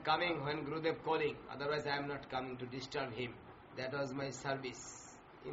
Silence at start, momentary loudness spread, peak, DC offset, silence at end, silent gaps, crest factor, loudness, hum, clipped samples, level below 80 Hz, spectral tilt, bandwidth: 0 s; 13 LU; -20 dBFS; under 0.1%; 0 s; none; 20 dB; -40 LUFS; none; under 0.1%; -68 dBFS; -3 dB/octave; 7.6 kHz